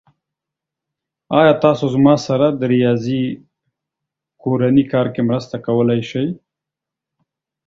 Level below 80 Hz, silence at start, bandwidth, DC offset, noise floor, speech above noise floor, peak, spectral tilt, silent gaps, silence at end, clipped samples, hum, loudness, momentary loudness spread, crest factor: -56 dBFS; 1.3 s; 7.6 kHz; under 0.1%; -85 dBFS; 70 dB; 0 dBFS; -7.5 dB/octave; none; 1.3 s; under 0.1%; none; -16 LUFS; 10 LU; 18 dB